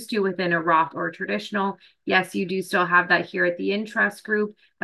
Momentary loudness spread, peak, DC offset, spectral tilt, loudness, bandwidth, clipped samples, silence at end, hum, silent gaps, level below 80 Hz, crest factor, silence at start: 9 LU; -6 dBFS; under 0.1%; -5 dB/octave; -23 LUFS; 12.5 kHz; under 0.1%; 0.3 s; none; none; -72 dBFS; 18 dB; 0 s